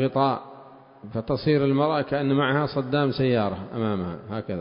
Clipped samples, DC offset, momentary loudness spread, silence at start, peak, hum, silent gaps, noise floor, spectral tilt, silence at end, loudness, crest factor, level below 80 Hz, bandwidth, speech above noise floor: under 0.1%; under 0.1%; 11 LU; 0 s; -8 dBFS; none; none; -47 dBFS; -11.5 dB/octave; 0 s; -25 LUFS; 16 dB; -52 dBFS; 5.4 kHz; 23 dB